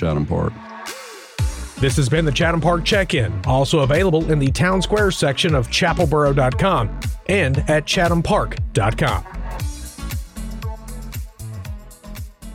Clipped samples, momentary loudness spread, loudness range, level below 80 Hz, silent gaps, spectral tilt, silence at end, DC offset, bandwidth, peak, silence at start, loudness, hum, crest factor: under 0.1%; 16 LU; 8 LU; -30 dBFS; none; -5.5 dB/octave; 0 s; under 0.1%; 16.5 kHz; -6 dBFS; 0 s; -19 LUFS; none; 14 dB